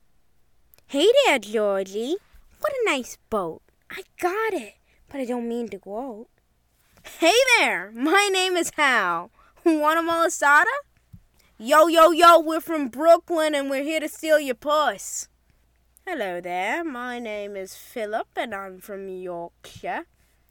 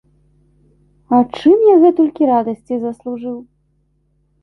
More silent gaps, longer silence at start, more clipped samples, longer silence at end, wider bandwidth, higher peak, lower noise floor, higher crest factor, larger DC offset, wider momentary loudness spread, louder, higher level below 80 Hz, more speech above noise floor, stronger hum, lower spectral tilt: neither; second, 0.9 s vs 1.1 s; neither; second, 0.5 s vs 1 s; first, 18.5 kHz vs 6 kHz; second, -6 dBFS vs -2 dBFS; first, -66 dBFS vs -61 dBFS; about the same, 18 dB vs 14 dB; neither; about the same, 18 LU vs 16 LU; second, -21 LUFS vs -14 LUFS; about the same, -62 dBFS vs -58 dBFS; second, 44 dB vs 48 dB; neither; second, -2 dB/octave vs -8 dB/octave